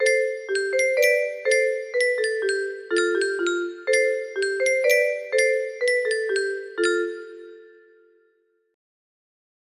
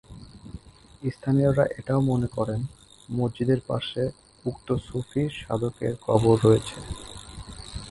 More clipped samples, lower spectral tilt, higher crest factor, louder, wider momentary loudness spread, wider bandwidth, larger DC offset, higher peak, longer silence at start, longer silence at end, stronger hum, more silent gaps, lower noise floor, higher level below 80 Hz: neither; second, -0.5 dB/octave vs -7.5 dB/octave; about the same, 18 dB vs 22 dB; first, -22 LUFS vs -26 LUFS; second, 7 LU vs 20 LU; first, 13 kHz vs 11.5 kHz; neither; about the same, -6 dBFS vs -4 dBFS; about the same, 0 s vs 0.1 s; first, 2.05 s vs 0 s; neither; neither; first, -66 dBFS vs -45 dBFS; second, -72 dBFS vs -46 dBFS